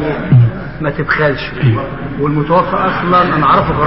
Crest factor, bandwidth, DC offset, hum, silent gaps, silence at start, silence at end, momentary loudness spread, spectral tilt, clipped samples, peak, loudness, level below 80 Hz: 12 dB; 5.8 kHz; 2%; none; none; 0 s; 0 s; 8 LU; -6 dB/octave; under 0.1%; 0 dBFS; -13 LUFS; -34 dBFS